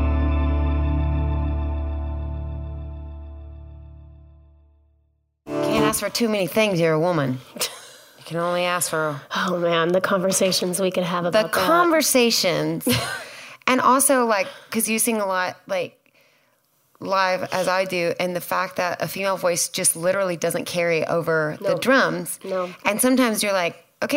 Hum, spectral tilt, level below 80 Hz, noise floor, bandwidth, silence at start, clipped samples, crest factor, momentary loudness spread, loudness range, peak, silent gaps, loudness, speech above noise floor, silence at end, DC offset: none; -4 dB/octave; -32 dBFS; -66 dBFS; 16.5 kHz; 0 s; under 0.1%; 20 dB; 13 LU; 9 LU; -2 dBFS; none; -21 LUFS; 45 dB; 0 s; under 0.1%